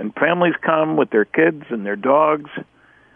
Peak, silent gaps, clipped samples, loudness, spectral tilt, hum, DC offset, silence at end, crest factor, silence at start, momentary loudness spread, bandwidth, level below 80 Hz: -4 dBFS; none; under 0.1%; -18 LUFS; -9.5 dB/octave; none; under 0.1%; 0.5 s; 16 dB; 0 s; 10 LU; 3.6 kHz; -66 dBFS